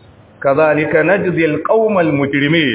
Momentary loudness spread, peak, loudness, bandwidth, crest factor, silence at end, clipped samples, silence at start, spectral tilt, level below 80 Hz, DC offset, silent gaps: 3 LU; 0 dBFS; -14 LUFS; 4 kHz; 14 dB; 0 s; under 0.1%; 0.4 s; -10 dB/octave; -50 dBFS; under 0.1%; none